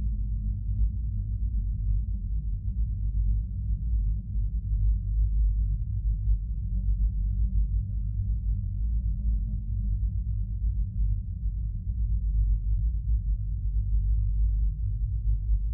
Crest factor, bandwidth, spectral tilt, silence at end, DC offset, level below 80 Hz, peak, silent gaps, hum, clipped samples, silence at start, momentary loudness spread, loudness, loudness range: 12 dB; 0.6 kHz; -14.5 dB/octave; 0 s; under 0.1%; -28 dBFS; -14 dBFS; none; none; under 0.1%; 0 s; 4 LU; -31 LUFS; 2 LU